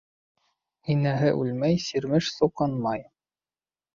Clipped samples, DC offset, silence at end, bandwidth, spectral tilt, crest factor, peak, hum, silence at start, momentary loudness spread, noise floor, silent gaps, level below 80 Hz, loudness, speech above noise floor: under 0.1%; under 0.1%; 0.95 s; 7.4 kHz; -6.5 dB/octave; 18 dB; -8 dBFS; none; 0.85 s; 7 LU; under -90 dBFS; none; -60 dBFS; -26 LUFS; over 65 dB